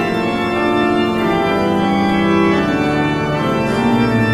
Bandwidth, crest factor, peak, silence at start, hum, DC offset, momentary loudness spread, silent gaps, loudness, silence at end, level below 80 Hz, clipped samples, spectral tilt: 15 kHz; 12 dB; -2 dBFS; 0 s; none; under 0.1%; 3 LU; none; -15 LUFS; 0 s; -40 dBFS; under 0.1%; -6.5 dB/octave